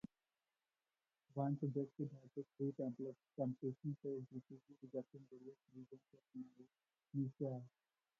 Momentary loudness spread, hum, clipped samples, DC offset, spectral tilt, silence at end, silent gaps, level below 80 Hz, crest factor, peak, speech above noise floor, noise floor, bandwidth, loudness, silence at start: 17 LU; none; under 0.1%; under 0.1%; -12 dB/octave; 0.5 s; none; -86 dBFS; 20 dB; -28 dBFS; over 43 dB; under -90 dBFS; 6.6 kHz; -47 LUFS; 1.35 s